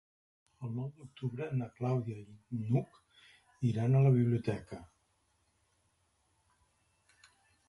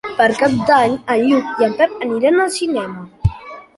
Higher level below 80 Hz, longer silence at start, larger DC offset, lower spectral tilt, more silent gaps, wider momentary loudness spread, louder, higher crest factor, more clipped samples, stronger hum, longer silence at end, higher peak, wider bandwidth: second, -66 dBFS vs -36 dBFS; first, 0.6 s vs 0.05 s; neither; first, -9.5 dB/octave vs -5.5 dB/octave; neither; first, 19 LU vs 9 LU; second, -34 LUFS vs -16 LUFS; about the same, 18 dB vs 14 dB; neither; neither; first, 2.85 s vs 0.15 s; second, -18 dBFS vs -2 dBFS; about the same, 11 kHz vs 11.5 kHz